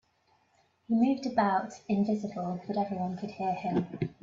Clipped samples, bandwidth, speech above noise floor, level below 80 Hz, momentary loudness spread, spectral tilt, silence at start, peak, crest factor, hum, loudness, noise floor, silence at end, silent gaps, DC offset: under 0.1%; 7.6 kHz; 40 dB; -68 dBFS; 8 LU; -7.5 dB/octave; 0.9 s; -14 dBFS; 18 dB; none; -31 LUFS; -70 dBFS; 0.1 s; none; under 0.1%